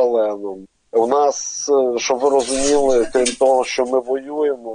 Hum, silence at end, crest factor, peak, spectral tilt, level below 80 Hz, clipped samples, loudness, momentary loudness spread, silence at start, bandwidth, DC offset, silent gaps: none; 0 s; 16 dB; -2 dBFS; -2 dB/octave; -46 dBFS; under 0.1%; -17 LUFS; 7 LU; 0 s; 10 kHz; under 0.1%; none